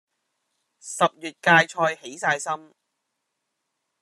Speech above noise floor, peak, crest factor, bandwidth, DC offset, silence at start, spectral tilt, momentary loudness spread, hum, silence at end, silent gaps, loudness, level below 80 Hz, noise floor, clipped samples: 56 dB; -4 dBFS; 22 dB; 13 kHz; under 0.1%; 0.85 s; -3.5 dB/octave; 14 LU; none; 1.45 s; none; -22 LUFS; -78 dBFS; -79 dBFS; under 0.1%